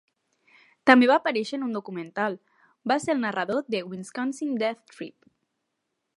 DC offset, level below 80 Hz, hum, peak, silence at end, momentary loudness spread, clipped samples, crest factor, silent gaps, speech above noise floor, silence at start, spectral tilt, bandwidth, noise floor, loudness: under 0.1%; -76 dBFS; none; 0 dBFS; 1.1 s; 20 LU; under 0.1%; 26 dB; none; 55 dB; 0.85 s; -4.5 dB/octave; 11.5 kHz; -80 dBFS; -25 LUFS